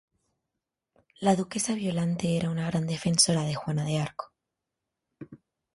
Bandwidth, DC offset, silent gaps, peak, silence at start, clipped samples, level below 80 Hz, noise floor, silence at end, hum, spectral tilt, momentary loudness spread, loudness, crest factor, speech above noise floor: 11.5 kHz; under 0.1%; none; -8 dBFS; 1.2 s; under 0.1%; -62 dBFS; -86 dBFS; 0.4 s; none; -4.5 dB/octave; 22 LU; -27 LUFS; 22 dB; 59 dB